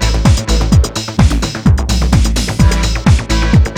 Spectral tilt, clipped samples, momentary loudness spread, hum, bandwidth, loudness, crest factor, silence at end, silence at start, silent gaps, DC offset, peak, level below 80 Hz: -5.5 dB/octave; under 0.1%; 2 LU; none; 15.5 kHz; -12 LUFS; 10 dB; 0 s; 0 s; none; under 0.1%; 0 dBFS; -14 dBFS